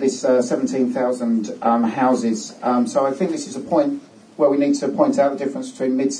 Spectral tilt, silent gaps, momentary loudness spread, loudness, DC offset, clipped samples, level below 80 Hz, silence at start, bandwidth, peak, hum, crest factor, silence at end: -5.5 dB/octave; none; 6 LU; -20 LUFS; under 0.1%; under 0.1%; -70 dBFS; 0 s; 10 kHz; -4 dBFS; none; 16 dB; 0 s